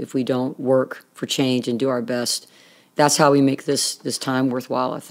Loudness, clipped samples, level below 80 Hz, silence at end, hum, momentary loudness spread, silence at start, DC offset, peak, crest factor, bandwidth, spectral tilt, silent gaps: -21 LUFS; under 0.1%; -76 dBFS; 0 s; none; 10 LU; 0 s; under 0.1%; -2 dBFS; 20 dB; 16.5 kHz; -4 dB/octave; none